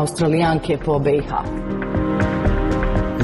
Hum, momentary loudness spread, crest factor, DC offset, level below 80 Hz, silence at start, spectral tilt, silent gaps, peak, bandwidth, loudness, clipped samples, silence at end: none; 7 LU; 12 dB; under 0.1%; -28 dBFS; 0 s; -7 dB/octave; none; -8 dBFS; 12 kHz; -20 LUFS; under 0.1%; 0 s